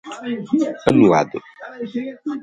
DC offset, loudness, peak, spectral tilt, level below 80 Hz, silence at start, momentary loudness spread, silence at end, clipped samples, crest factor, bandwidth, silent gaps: under 0.1%; -19 LUFS; 0 dBFS; -7 dB/octave; -54 dBFS; 0.05 s; 18 LU; 0 s; under 0.1%; 20 dB; 11 kHz; none